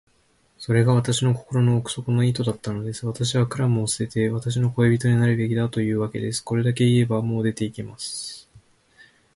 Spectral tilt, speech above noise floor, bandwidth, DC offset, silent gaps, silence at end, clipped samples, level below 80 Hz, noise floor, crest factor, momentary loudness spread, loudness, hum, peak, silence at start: -6 dB/octave; 41 dB; 11.5 kHz; under 0.1%; none; 0.75 s; under 0.1%; -54 dBFS; -62 dBFS; 16 dB; 11 LU; -23 LUFS; none; -6 dBFS; 0.6 s